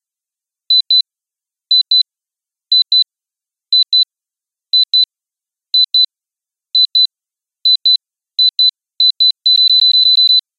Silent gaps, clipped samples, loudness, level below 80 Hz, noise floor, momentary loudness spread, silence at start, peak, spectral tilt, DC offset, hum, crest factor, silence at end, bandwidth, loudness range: none; under 0.1%; -10 LUFS; under -90 dBFS; -87 dBFS; 8 LU; 0.7 s; -2 dBFS; 6.5 dB/octave; under 0.1%; none; 12 dB; 0.2 s; 6.2 kHz; 3 LU